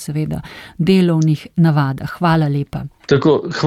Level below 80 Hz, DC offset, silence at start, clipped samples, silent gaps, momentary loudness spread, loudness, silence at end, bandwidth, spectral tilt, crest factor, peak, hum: -44 dBFS; under 0.1%; 0 s; under 0.1%; none; 12 LU; -16 LUFS; 0 s; 13.5 kHz; -7.5 dB/octave; 14 dB; -2 dBFS; none